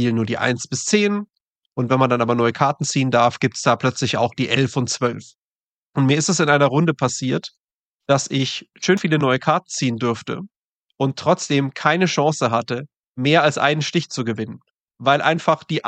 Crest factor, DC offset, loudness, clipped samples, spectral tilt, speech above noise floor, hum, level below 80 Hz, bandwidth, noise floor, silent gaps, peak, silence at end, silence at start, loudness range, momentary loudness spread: 18 dB; under 0.1%; -19 LUFS; under 0.1%; -4.5 dB/octave; over 71 dB; none; -64 dBFS; 9.2 kHz; under -90 dBFS; 1.41-1.72 s, 5.35-5.82 s, 5.89-5.93 s, 7.60-7.98 s, 10.57-10.86 s, 12.96-13.15 s, 14.70-14.74 s, 14.80-14.86 s; -2 dBFS; 0 s; 0 s; 2 LU; 10 LU